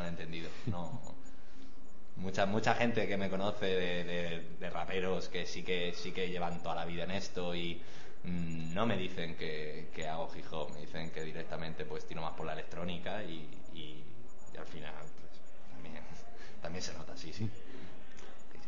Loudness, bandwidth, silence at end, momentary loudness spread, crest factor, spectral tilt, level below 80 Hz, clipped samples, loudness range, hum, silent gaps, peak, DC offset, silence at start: -39 LUFS; 7.6 kHz; 0 s; 20 LU; 26 dB; -5 dB/octave; -60 dBFS; under 0.1%; 12 LU; none; none; -16 dBFS; 3%; 0 s